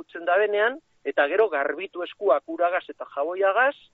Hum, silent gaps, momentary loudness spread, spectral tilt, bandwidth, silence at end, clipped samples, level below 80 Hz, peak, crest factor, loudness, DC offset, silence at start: none; none; 10 LU; 1 dB/octave; 4.3 kHz; 0.2 s; under 0.1%; -76 dBFS; -8 dBFS; 16 dB; -24 LUFS; under 0.1%; 0.15 s